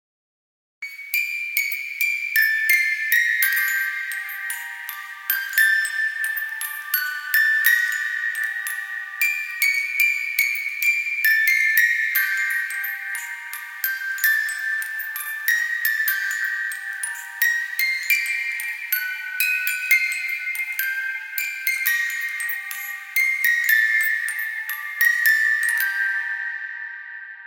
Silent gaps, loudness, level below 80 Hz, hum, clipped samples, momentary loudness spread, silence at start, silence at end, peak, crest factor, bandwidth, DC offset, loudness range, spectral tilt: none; -20 LUFS; under -90 dBFS; none; under 0.1%; 11 LU; 0.8 s; 0 s; -2 dBFS; 22 dB; 17.5 kHz; under 0.1%; 4 LU; 8.5 dB/octave